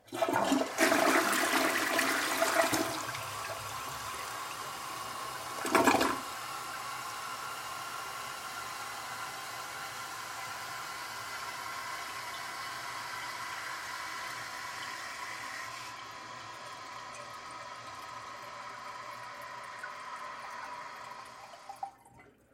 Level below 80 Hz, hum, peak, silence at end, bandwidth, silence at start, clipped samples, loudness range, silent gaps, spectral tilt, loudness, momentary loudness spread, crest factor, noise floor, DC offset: -70 dBFS; none; -10 dBFS; 0.25 s; 16.5 kHz; 0.05 s; under 0.1%; 14 LU; none; -2 dB/octave; -35 LUFS; 16 LU; 26 dB; -59 dBFS; under 0.1%